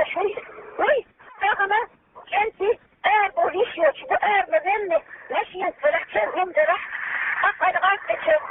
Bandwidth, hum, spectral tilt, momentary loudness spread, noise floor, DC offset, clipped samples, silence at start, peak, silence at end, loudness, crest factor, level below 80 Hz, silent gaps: 3.9 kHz; none; 0.5 dB/octave; 7 LU; -42 dBFS; under 0.1%; under 0.1%; 0 s; -8 dBFS; 0 s; -22 LUFS; 16 dB; -60 dBFS; none